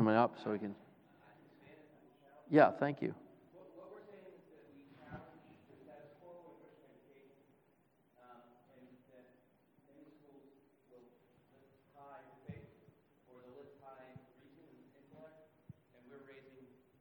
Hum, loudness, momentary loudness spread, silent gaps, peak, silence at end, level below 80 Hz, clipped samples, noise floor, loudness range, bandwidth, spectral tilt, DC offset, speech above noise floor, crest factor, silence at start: none; -34 LUFS; 30 LU; none; -14 dBFS; 0.8 s; -82 dBFS; under 0.1%; -74 dBFS; 25 LU; 19.5 kHz; -9 dB/octave; under 0.1%; 41 dB; 30 dB; 0 s